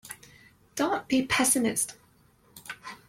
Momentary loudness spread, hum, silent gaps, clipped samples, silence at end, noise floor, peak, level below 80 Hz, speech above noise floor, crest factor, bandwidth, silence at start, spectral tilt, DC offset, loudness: 21 LU; none; none; under 0.1%; 0.1 s; -62 dBFS; -10 dBFS; -62 dBFS; 35 dB; 20 dB; 16.5 kHz; 0.05 s; -2 dB/octave; under 0.1%; -26 LUFS